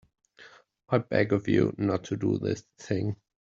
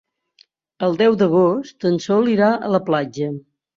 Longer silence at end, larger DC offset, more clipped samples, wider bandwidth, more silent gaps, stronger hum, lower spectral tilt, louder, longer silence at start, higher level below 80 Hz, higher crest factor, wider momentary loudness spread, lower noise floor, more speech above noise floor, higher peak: about the same, 0.3 s vs 0.4 s; neither; neither; about the same, 7.6 kHz vs 7.4 kHz; neither; neither; about the same, -7.5 dB/octave vs -7 dB/octave; second, -28 LUFS vs -18 LUFS; second, 0.4 s vs 0.8 s; about the same, -62 dBFS vs -62 dBFS; about the same, 20 dB vs 16 dB; about the same, 8 LU vs 10 LU; about the same, -55 dBFS vs -57 dBFS; second, 27 dB vs 40 dB; second, -8 dBFS vs -4 dBFS